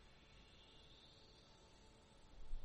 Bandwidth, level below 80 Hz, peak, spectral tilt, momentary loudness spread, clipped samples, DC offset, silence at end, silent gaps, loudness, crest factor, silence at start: 9.2 kHz; -58 dBFS; -36 dBFS; -4 dB/octave; 3 LU; under 0.1%; under 0.1%; 0 s; none; -65 LUFS; 18 dB; 0 s